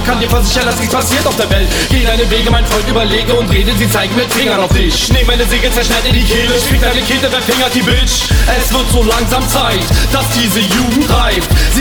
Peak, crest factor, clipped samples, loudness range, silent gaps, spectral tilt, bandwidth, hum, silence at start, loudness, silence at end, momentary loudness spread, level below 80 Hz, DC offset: 0 dBFS; 10 dB; under 0.1%; 1 LU; none; -4 dB/octave; over 20 kHz; none; 0 s; -11 LUFS; 0 s; 1 LU; -16 dBFS; under 0.1%